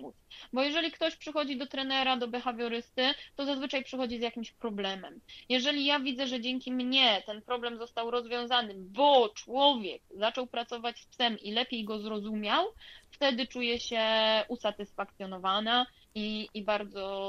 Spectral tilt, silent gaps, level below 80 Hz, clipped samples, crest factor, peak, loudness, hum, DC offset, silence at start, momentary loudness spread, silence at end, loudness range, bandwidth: -3.5 dB/octave; none; -66 dBFS; under 0.1%; 22 dB; -10 dBFS; -31 LUFS; none; under 0.1%; 0 s; 11 LU; 0 s; 4 LU; 12.5 kHz